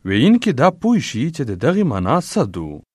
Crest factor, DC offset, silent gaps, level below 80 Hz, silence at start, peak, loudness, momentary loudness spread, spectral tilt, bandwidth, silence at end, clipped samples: 16 dB; under 0.1%; none; -48 dBFS; 0.05 s; 0 dBFS; -17 LUFS; 9 LU; -6.5 dB/octave; 12.5 kHz; 0.15 s; under 0.1%